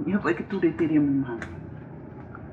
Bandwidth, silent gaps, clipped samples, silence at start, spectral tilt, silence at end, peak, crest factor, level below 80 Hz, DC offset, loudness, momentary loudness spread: 7.6 kHz; none; under 0.1%; 0 s; -8.5 dB/octave; 0 s; -12 dBFS; 14 dB; -54 dBFS; under 0.1%; -25 LUFS; 19 LU